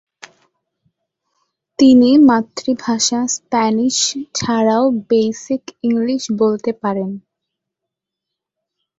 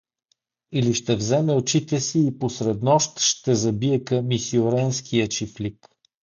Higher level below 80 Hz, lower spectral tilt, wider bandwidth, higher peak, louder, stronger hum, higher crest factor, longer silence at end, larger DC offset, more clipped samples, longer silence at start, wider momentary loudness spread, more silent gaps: about the same, -58 dBFS vs -56 dBFS; about the same, -4 dB/octave vs -5 dB/octave; second, 8 kHz vs 9.6 kHz; first, -2 dBFS vs -6 dBFS; first, -15 LUFS vs -22 LUFS; neither; about the same, 16 dB vs 16 dB; first, 1.8 s vs 0.6 s; neither; neither; first, 1.8 s vs 0.7 s; first, 12 LU vs 6 LU; neither